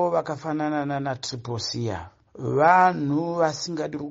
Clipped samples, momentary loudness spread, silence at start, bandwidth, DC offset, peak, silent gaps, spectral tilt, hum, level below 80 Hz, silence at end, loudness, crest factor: under 0.1%; 13 LU; 0 s; 8 kHz; under 0.1%; -4 dBFS; none; -4.5 dB/octave; none; -60 dBFS; 0 s; -24 LUFS; 20 dB